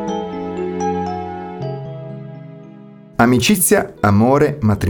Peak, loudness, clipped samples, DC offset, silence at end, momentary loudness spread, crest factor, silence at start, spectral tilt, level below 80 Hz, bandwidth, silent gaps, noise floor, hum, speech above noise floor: 0 dBFS; -17 LUFS; under 0.1%; under 0.1%; 0 s; 19 LU; 16 dB; 0 s; -5 dB/octave; -44 dBFS; over 20 kHz; none; -39 dBFS; none; 26 dB